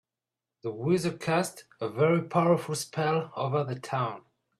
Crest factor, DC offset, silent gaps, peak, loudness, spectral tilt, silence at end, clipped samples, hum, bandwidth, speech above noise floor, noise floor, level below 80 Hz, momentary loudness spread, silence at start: 18 dB; under 0.1%; none; -12 dBFS; -29 LUFS; -6 dB/octave; 0.4 s; under 0.1%; none; 14 kHz; 62 dB; -90 dBFS; -70 dBFS; 11 LU; 0.65 s